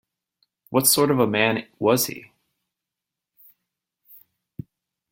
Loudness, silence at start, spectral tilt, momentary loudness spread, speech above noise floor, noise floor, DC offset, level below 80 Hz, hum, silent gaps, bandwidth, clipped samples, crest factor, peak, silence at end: -20 LUFS; 0.7 s; -3.5 dB/octave; 24 LU; 66 dB; -86 dBFS; under 0.1%; -64 dBFS; none; none; 17 kHz; under 0.1%; 22 dB; -4 dBFS; 2.85 s